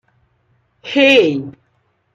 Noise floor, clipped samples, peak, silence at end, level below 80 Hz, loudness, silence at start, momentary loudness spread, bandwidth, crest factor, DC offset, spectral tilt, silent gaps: -63 dBFS; under 0.1%; 0 dBFS; 0.65 s; -64 dBFS; -13 LUFS; 0.85 s; 24 LU; 7.8 kHz; 16 dB; under 0.1%; -4.5 dB/octave; none